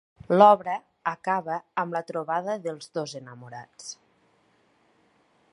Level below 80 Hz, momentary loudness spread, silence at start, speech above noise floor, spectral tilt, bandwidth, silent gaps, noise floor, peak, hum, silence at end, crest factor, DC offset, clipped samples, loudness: -72 dBFS; 24 LU; 0.3 s; 40 dB; -5.5 dB/octave; 11 kHz; none; -65 dBFS; -4 dBFS; none; 1.6 s; 24 dB; under 0.1%; under 0.1%; -25 LUFS